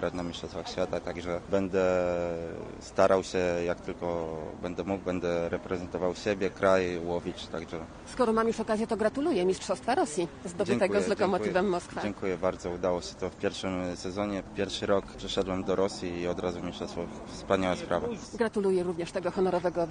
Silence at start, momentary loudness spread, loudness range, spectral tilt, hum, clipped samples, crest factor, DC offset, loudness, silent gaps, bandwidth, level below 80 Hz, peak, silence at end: 0 s; 10 LU; 3 LU; -5.5 dB/octave; none; under 0.1%; 22 dB; under 0.1%; -30 LUFS; none; 10 kHz; -54 dBFS; -8 dBFS; 0 s